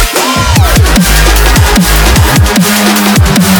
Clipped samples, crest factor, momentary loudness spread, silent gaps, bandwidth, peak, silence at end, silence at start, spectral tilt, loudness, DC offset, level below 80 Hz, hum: 0.8%; 6 dB; 1 LU; none; over 20 kHz; 0 dBFS; 0 s; 0 s; -4 dB/octave; -6 LUFS; under 0.1%; -12 dBFS; none